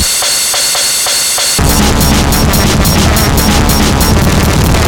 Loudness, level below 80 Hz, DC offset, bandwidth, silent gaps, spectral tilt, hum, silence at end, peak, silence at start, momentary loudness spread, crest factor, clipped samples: -8 LUFS; -16 dBFS; under 0.1%; 18 kHz; none; -3.5 dB/octave; none; 0 s; 0 dBFS; 0 s; 1 LU; 8 dB; under 0.1%